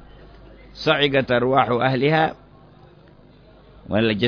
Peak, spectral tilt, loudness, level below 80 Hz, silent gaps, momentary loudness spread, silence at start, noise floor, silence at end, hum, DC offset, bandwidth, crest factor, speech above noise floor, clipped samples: -4 dBFS; -7 dB/octave; -20 LUFS; -50 dBFS; none; 6 LU; 0.25 s; -49 dBFS; 0 s; none; under 0.1%; 5.4 kHz; 18 dB; 30 dB; under 0.1%